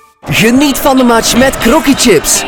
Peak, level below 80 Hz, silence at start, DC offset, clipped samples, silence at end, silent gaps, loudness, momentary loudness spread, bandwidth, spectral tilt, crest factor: 0 dBFS; -28 dBFS; 0.25 s; under 0.1%; 1%; 0 s; none; -8 LUFS; 2 LU; over 20 kHz; -3 dB/octave; 8 dB